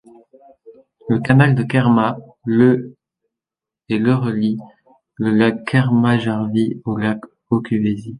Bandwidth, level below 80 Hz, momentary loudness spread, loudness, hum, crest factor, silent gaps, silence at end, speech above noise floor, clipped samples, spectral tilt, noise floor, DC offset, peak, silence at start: 10.5 kHz; -54 dBFS; 9 LU; -17 LUFS; none; 16 dB; none; 0 s; 72 dB; under 0.1%; -8.5 dB/octave; -88 dBFS; under 0.1%; -2 dBFS; 0.65 s